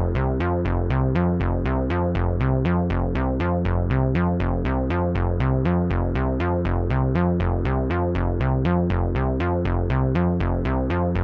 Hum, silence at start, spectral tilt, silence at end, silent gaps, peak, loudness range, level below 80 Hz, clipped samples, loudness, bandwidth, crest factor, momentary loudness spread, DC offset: none; 0 s; -10 dB/octave; 0 s; none; -10 dBFS; 0 LU; -28 dBFS; under 0.1%; -23 LUFS; 5.2 kHz; 12 dB; 2 LU; under 0.1%